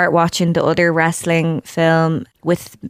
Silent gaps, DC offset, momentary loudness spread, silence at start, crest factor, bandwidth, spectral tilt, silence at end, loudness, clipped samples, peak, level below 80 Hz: none; under 0.1%; 6 LU; 0 s; 14 dB; 15.5 kHz; -5.5 dB/octave; 0 s; -16 LUFS; under 0.1%; -2 dBFS; -52 dBFS